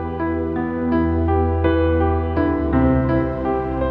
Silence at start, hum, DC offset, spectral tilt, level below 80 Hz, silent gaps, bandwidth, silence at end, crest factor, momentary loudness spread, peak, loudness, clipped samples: 0 s; none; under 0.1%; -11 dB/octave; -28 dBFS; none; 4.7 kHz; 0 s; 14 dB; 5 LU; -4 dBFS; -19 LUFS; under 0.1%